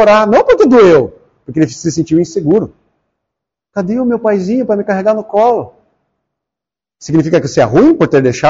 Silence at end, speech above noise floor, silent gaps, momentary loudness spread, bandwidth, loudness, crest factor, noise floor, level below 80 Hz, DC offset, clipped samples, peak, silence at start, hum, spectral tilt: 0 s; 76 dB; none; 13 LU; 7.8 kHz; -11 LUFS; 10 dB; -85 dBFS; -44 dBFS; under 0.1%; under 0.1%; 0 dBFS; 0 s; none; -6 dB/octave